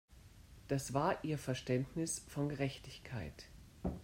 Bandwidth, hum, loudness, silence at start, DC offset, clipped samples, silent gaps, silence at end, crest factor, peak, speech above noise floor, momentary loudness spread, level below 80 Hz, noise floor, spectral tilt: 16 kHz; none; -40 LUFS; 0.1 s; under 0.1%; under 0.1%; none; 0 s; 20 dB; -20 dBFS; 20 dB; 17 LU; -58 dBFS; -59 dBFS; -5.5 dB/octave